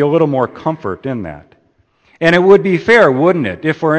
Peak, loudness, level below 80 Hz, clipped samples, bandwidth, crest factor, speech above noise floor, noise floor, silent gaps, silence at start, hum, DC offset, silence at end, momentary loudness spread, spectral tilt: 0 dBFS; -12 LUFS; -50 dBFS; under 0.1%; 8.6 kHz; 14 dB; 44 dB; -56 dBFS; none; 0 s; none; under 0.1%; 0 s; 13 LU; -7 dB/octave